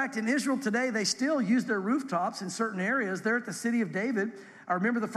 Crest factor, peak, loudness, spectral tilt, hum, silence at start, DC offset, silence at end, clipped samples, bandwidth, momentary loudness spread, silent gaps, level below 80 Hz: 14 dB; -16 dBFS; -29 LUFS; -4.5 dB/octave; none; 0 s; under 0.1%; 0 s; under 0.1%; 13 kHz; 5 LU; none; -82 dBFS